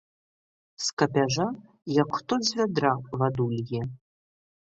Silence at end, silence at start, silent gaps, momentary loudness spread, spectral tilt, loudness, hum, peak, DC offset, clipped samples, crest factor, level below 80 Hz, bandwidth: 0.75 s; 0.8 s; 0.93-0.97 s; 8 LU; -5 dB/octave; -27 LUFS; none; -6 dBFS; under 0.1%; under 0.1%; 22 dB; -62 dBFS; 8.2 kHz